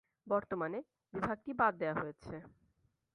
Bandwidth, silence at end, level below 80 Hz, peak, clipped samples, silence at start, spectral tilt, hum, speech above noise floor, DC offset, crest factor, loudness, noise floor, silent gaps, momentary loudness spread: 10.5 kHz; 0.65 s; -68 dBFS; -18 dBFS; under 0.1%; 0.25 s; -8 dB/octave; none; 39 dB; under 0.1%; 22 dB; -37 LUFS; -77 dBFS; none; 16 LU